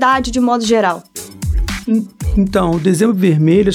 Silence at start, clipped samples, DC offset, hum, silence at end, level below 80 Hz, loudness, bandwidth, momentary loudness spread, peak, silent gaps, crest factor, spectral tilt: 0 s; under 0.1%; under 0.1%; none; 0 s; -26 dBFS; -15 LUFS; 16.5 kHz; 9 LU; -2 dBFS; none; 12 dB; -6 dB/octave